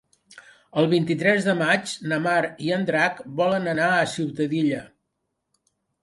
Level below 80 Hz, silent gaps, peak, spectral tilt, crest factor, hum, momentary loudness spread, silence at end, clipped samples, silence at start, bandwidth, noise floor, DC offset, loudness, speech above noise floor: -66 dBFS; none; -6 dBFS; -5.5 dB/octave; 18 dB; none; 5 LU; 1.15 s; under 0.1%; 0.3 s; 11.5 kHz; -78 dBFS; under 0.1%; -23 LUFS; 55 dB